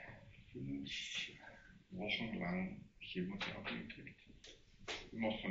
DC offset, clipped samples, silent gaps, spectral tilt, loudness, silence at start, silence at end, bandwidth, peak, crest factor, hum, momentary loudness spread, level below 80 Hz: under 0.1%; under 0.1%; none; -3.5 dB/octave; -44 LUFS; 0 s; 0 s; 7.6 kHz; -26 dBFS; 18 dB; none; 18 LU; -66 dBFS